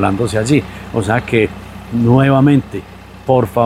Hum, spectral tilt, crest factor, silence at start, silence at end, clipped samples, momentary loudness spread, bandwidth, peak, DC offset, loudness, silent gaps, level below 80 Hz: none; -7 dB/octave; 14 dB; 0 s; 0 s; under 0.1%; 17 LU; 14.5 kHz; 0 dBFS; under 0.1%; -14 LUFS; none; -38 dBFS